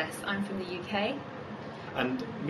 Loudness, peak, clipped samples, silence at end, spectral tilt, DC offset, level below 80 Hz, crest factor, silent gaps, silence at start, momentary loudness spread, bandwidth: -34 LUFS; -14 dBFS; under 0.1%; 0 s; -5 dB/octave; under 0.1%; -64 dBFS; 20 dB; none; 0 s; 10 LU; 13 kHz